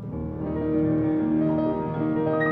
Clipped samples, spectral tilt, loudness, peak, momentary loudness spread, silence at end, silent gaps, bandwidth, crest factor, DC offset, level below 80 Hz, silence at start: under 0.1%; -11 dB/octave; -25 LUFS; -12 dBFS; 7 LU; 0 s; none; 4.1 kHz; 12 dB; under 0.1%; -48 dBFS; 0 s